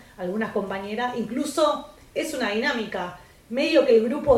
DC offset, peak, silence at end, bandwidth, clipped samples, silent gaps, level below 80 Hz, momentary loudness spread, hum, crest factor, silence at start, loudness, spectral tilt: under 0.1%; -6 dBFS; 0 s; 15.5 kHz; under 0.1%; none; -52 dBFS; 12 LU; none; 18 dB; 0.2 s; -24 LUFS; -4.5 dB/octave